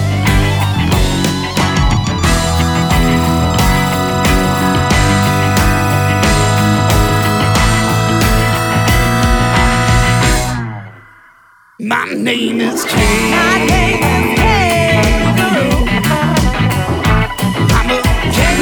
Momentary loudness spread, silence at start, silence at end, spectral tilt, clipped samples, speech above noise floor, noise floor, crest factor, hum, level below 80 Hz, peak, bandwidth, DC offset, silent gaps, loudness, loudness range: 4 LU; 0 s; 0 s; -5 dB/octave; under 0.1%; 34 dB; -46 dBFS; 12 dB; none; -20 dBFS; 0 dBFS; over 20 kHz; under 0.1%; none; -12 LUFS; 3 LU